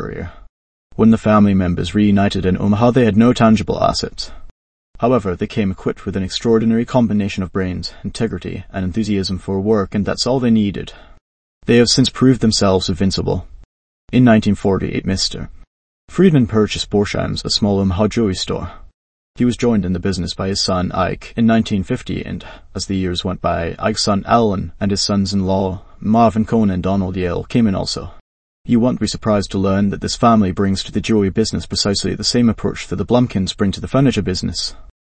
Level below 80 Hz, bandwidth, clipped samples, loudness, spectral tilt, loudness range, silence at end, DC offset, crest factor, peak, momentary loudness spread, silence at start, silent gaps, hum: -36 dBFS; 8.8 kHz; under 0.1%; -17 LUFS; -5.5 dB/octave; 4 LU; 0.15 s; under 0.1%; 16 dB; 0 dBFS; 11 LU; 0 s; 0.49-0.90 s, 4.51-4.94 s, 11.21-11.61 s, 13.65-14.08 s, 15.67-16.08 s, 18.94-19.34 s, 28.20-28.64 s; none